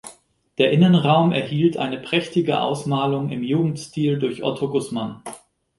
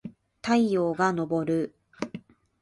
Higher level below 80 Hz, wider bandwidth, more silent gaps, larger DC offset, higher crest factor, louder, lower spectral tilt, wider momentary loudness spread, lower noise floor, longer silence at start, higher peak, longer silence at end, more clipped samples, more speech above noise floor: first, -60 dBFS vs -66 dBFS; about the same, 11.5 kHz vs 11.5 kHz; neither; neither; about the same, 18 dB vs 18 dB; first, -20 LUFS vs -27 LUFS; about the same, -6.5 dB/octave vs -6.5 dB/octave; second, 12 LU vs 15 LU; first, -50 dBFS vs -45 dBFS; about the same, 0.05 s vs 0.05 s; first, -2 dBFS vs -10 dBFS; about the same, 0.4 s vs 0.4 s; neither; first, 30 dB vs 20 dB